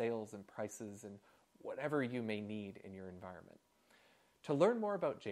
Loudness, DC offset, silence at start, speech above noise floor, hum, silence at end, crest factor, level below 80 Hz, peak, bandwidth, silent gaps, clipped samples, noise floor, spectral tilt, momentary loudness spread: -40 LUFS; under 0.1%; 0 s; 30 dB; none; 0 s; 24 dB; -86 dBFS; -18 dBFS; 14 kHz; none; under 0.1%; -70 dBFS; -6 dB/octave; 20 LU